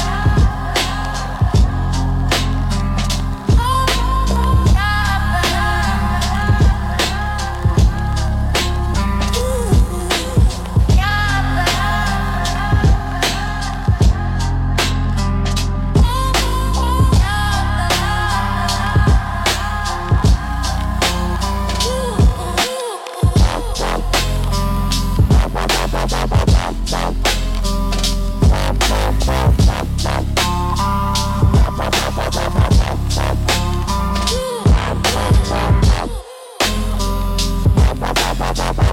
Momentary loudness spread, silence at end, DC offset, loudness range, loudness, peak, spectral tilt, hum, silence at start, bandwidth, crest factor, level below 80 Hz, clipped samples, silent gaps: 5 LU; 0 s; under 0.1%; 1 LU; -17 LUFS; -2 dBFS; -5 dB/octave; none; 0 s; 17 kHz; 14 dB; -18 dBFS; under 0.1%; none